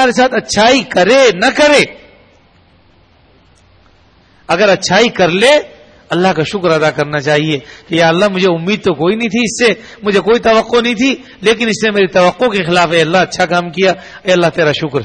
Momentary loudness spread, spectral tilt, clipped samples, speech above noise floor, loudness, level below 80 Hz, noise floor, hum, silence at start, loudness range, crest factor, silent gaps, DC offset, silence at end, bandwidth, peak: 6 LU; -4 dB/octave; under 0.1%; 37 dB; -11 LUFS; -46 dBFS; -48 dBFS; none; 0 s; 3 LU; 12 dB; none; under 0.1%; 0 s; 10.5 kHz; 0 dBFS